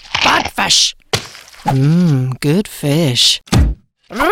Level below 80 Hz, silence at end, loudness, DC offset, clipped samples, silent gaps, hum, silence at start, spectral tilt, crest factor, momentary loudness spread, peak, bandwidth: -26 dBFS; 0 s; -13 LUFS; under 0.1%; under 0.1%; none; none; 0.1 s; -4 dB/octave; 12 dB; 10 LU; -2 dBFS; 16.5 kHz